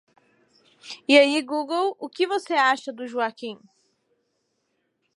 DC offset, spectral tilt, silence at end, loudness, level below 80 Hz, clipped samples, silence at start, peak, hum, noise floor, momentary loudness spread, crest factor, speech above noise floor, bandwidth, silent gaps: under 0.1%; -2.5 dB/octave; 1.6 s; -22 LUFS; -86 dBFS; under 0.1%; 0.85 s; -2 dBFS; none; -74 dBFS; 18 LU; 22 dB; 51 dB; 11.5 kHz; none